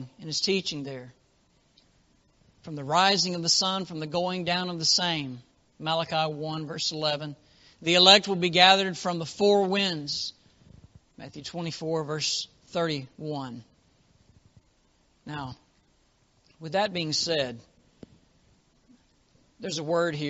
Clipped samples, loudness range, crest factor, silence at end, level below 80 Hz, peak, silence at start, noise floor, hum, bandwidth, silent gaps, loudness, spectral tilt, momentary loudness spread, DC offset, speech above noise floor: under 0.1%; 14 LU; 28 dB; 0 s; -66 dBFS; 0 dBFS; 0 s; -66 dBFS; none; 8 kHz; none; -25 LUFS; -2 dB/octave; 21 LU; under 0.1%; 39 dB